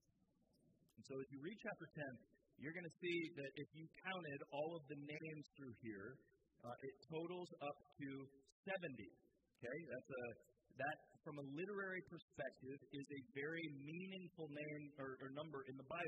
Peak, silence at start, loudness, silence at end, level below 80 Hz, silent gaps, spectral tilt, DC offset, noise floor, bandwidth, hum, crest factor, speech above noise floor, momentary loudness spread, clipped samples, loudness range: -34 dBFS; 0.65 s; -52 LUFS; 0 s; -88 dBFS; 8.52-8.63 s, 12.22-12.28 s; -6.5 dB/octave; under 0.1%; -82 dBFS; 8.2 kHz; none; 18 dB; 30 dB; 9 LU; under 0.1%; 3 LU